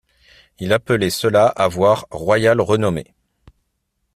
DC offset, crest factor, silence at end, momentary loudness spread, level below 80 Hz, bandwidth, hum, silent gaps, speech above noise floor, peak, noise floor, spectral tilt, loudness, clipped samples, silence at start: under 0.1%; 18 dB; 1.1 s; 6 LU; -50 dBFS; 15 kHz; none; none; 55 dB; -2 dBFS; -71 dBFS; -5.5 dB/octave; -17 LUFS; under 0.1%; 0.6 s